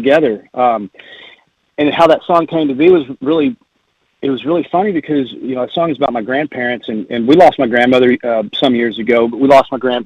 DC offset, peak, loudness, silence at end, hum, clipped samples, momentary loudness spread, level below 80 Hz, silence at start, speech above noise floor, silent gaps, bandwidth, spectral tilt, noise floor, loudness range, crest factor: under 0.1%; 0 dBFS; -13 LUFS; 0 s; none; 0.2%; 10 LU; -52 dBFS; 0 s; 50 dB; none; 9.6 kHz; -6.5 dB/octave; -62 dBFS; 5 LU; 14 dB